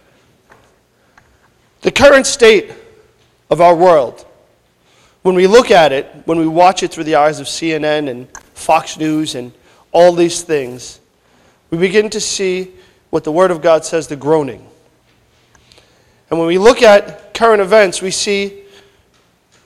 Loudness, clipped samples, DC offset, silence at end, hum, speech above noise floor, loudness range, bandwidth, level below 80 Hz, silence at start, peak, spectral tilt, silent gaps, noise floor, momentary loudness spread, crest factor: -12 LUFS; 0.5%; under 0.1%; 1.05 s; none; 43 dB; 5 LU; 14.5 kHz; -46 dBFS; 1.85 s; 0 dBFS; -4 dB/octave; none; -54 dBFS; 16 LU; 14 dB